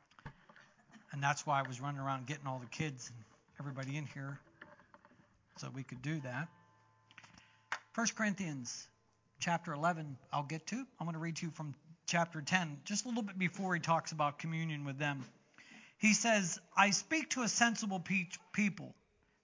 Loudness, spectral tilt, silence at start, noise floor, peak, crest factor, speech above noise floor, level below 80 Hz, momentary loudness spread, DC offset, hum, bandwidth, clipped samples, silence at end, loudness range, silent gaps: -37 LUFS; -4 dB/octave; 0.25 s; -69 dBFS; -14 dBFS; 24 dB; 31 dB; -78 dBFS; 18 LU; under 0.1%; none; 7.8 kHz; under 0.1%; 0.5 s; 13 LU; none